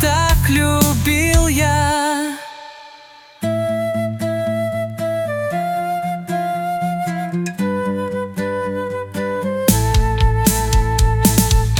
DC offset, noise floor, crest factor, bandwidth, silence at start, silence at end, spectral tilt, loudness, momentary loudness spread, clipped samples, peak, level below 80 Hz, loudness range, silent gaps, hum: under 0.1%; -43 dBFS; 16 dB; 19.5 kHz; 0 s; 0 s; -5 dB/octave; -18 LUFS; 9 LU; under 0.1%; 0 dBFS; -24 dBFS; 5 LU; none; none